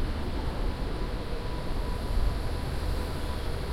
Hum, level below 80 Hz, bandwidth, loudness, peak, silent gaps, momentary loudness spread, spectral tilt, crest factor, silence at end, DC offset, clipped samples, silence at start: none; -32 dBFS; 15.5 kHz; -34 LUFS; -16 dBFS; none; 3 LU; -6 dB/octave; 14 dB; 0 s; under 0.1%; under 0.1%; 0 s